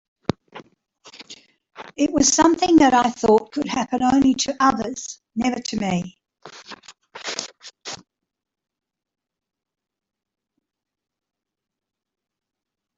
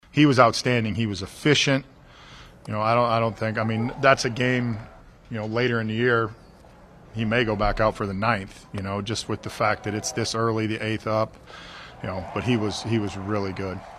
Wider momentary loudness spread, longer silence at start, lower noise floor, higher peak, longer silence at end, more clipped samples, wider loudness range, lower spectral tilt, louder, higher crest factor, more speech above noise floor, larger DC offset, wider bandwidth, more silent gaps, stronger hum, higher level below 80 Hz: first, 24 LU vs 13 LU; first, 0.55 s vs 0.15 s; about the same, -52 dBFS vs -49 dBFS; about the same, -4 dBFS vs -2 dBFS; first, 5.05 s vs 0 s; neither; first, 18 LU vs 4 LU; second, -3.5 dB/octave vs -5 dB/octave; first, -19 LUFS vs -24 LUFS; about the same, 20 dB vs 24 dB; first, 33 dB vs 25 dB; neither; second, 8 kHz vs 13.5 kHz; neither; neither; second, -54 dBFS vs -46 dBFS